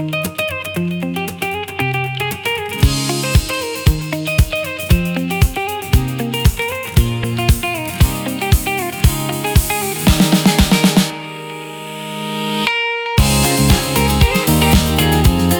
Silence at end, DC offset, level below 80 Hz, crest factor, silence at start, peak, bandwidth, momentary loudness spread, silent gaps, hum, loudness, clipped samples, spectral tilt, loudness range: 0 s; under 0.1%; -22 dBFS; 14 dB; 0 s; 0 dBFS; over 20 kHz; 9 LU; none; none; -16 LUFS; under 0.1%; -4.5 dB/octave; 3 LU